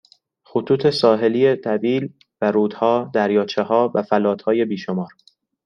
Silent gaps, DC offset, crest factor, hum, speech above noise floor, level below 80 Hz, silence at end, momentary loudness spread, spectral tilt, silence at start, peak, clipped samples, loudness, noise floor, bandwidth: none; under 0.1%; 16 dB; none; 35 dB; -66 dBFS; 0.6 s; 10 LU; -7 dB/octave; 0.55 s; -2 dBFS; under 0.1%; -19 LUFS; -54 dBFS; 10 kHz